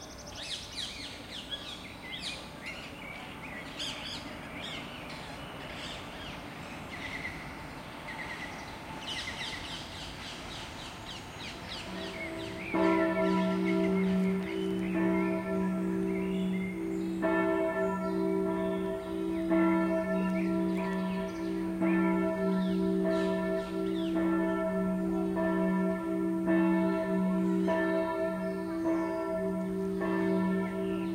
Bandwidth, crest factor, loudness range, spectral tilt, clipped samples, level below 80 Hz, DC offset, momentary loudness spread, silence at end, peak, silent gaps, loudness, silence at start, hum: 15.5 kHz; 16 dB; 10 LU; -6.5 dB/octave; under 0.1%; -56 dBFS; under 0.1%; 13 LU; 0 s; -16 dBFS; none; -32 LUFS; 0 s; none